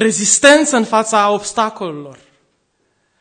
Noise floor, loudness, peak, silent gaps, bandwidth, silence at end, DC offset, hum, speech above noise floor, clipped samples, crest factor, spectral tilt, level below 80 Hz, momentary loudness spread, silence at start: -64 dBFS; -12 LUFS; 0 dBFS; none; 12 kHz; 1.1 s; under 0.1%; none; 50 dB; 0.2%; 16 dB; -2 dB/octave; -58 dBFS; 18 LU; 0 s